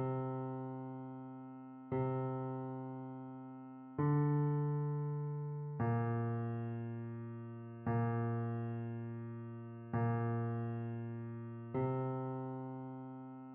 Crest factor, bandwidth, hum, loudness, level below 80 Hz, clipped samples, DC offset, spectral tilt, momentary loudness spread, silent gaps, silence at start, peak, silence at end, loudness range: 16 dB; 3.4 kHz; none; -40 LUFS; -72 dBFS; under 0.1%; under 0.1%; -10.5 dB/octave; 13 LU; none; 0 s; -24 dBFS; 0 s; 5 LU